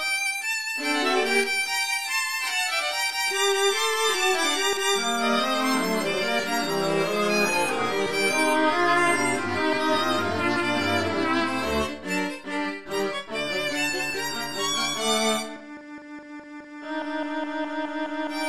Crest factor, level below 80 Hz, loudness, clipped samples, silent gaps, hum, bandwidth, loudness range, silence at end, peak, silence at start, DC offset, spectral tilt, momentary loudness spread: 18 dB; -56 dBFS; -24 LUFS; under 0.1%; none; none; 15.5 kHz; 5 LU; 0 s; -8 dBFS; 0 s; 0.7%; -2.5 dB/octave; 8 LU